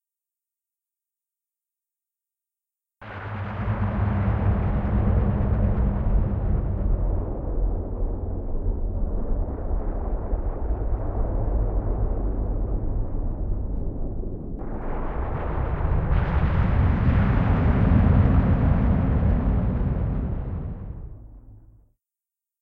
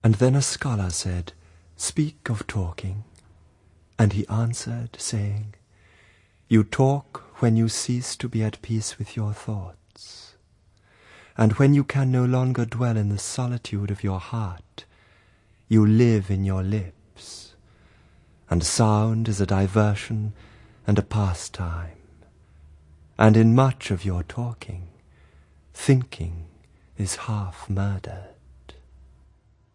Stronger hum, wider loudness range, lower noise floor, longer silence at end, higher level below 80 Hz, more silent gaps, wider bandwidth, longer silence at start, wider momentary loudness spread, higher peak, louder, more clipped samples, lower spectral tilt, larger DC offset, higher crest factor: neither; first, 9 LU vs 6 LU; first, -89 dBFS vs -60 dBFS; second, 1 s vs 1.45 s; first, -26 dBFS vs -50 dBFS; neither; second, 4.1 kHz vs 11.5 kHz; first, 3 s vs 0.05 s; second, 11 LU vs 21 LU; second, -6 dBFS vs 0 dBFS; about the same, -25 LUFS vs -24 LUFS; neither; first, -11.5 dB/octave vs -6 dB/octave; neither; second, 16 dB vs 24 dB